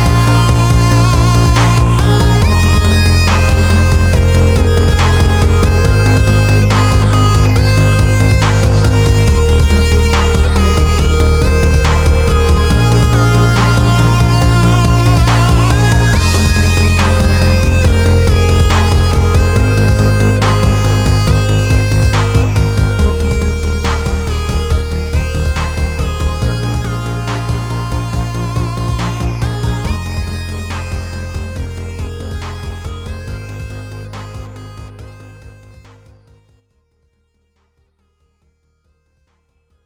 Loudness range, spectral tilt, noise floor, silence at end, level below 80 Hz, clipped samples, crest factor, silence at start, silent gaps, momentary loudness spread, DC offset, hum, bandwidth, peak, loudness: 14 LU; -5.5 dB/octave; -60 dBFS; 4.35 s; -16 dBFS; under 0.1%; 10 dB; 0 s; none; 14 LU; under 0.1%; none; 16.5 kHz; 0 dBFS; -11 LUFS